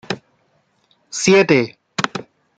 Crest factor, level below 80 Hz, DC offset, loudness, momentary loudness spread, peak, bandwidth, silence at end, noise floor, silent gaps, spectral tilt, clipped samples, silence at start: 20 dB; -58 dBFS; under 0.1%; -17 LUFS; 17 LU; 0 dBFS; 9.2 kHz; 0.35 s; -62 dBFS; none; -4 dB/octave; under 0.1%; 0.1 s